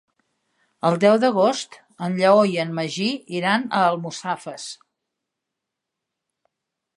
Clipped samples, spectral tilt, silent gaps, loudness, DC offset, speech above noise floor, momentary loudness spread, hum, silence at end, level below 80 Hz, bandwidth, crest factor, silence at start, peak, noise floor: under 0.1%; -5 dB/octave; none; -21 LUFS; under 0.1%; 63 dB; 16 LU; none; 2.2 s; -76 dBFS; 11.5 kHz; 20 dB; 0.85 s; -4 dBFS; -83 dBFS